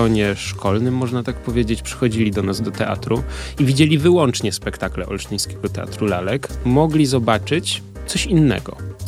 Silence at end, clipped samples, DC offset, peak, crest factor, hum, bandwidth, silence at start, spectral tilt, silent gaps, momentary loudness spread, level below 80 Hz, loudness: 0 s; under 0.1%; under 0.1%; -2 dBFS; 18 dB; none; 15 kHz; 0 s; -5.5 dB/octave; none; 10 LU; -34 dBFS; -19 LUFS